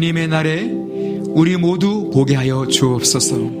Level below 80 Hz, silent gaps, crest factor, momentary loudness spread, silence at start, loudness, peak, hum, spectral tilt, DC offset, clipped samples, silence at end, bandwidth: -50 dBFS; none; 16 dB; 8 LU; 0 s; -16 LUFS; 0 dBFS; none; -4.5 dB/octave; under 0.1%; under 0.1%; 0 s; 15.5 kHz